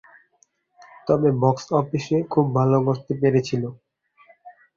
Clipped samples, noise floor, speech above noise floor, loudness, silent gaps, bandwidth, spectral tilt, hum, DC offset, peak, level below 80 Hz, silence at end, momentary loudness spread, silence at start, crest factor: under 0.1%; -64 dBFS; 44 dB; -21 LUFS; none; 7.4 kHz; -8 dB/octave; none; under 0.1%; -4 dBFS; -58 dBFS; 0.25 s; 8 LU; 1.05 s; 20 dB